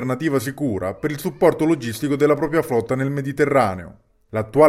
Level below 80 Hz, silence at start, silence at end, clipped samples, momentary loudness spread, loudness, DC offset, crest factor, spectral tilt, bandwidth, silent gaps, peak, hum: -52 dBFS; 0 s; 0 s; under 0.1%; 8 LU; -21 LUFS; under 0.1%; 18 dB; -6.5 dB/octave; 16 kHz; none; -2 dBFS; none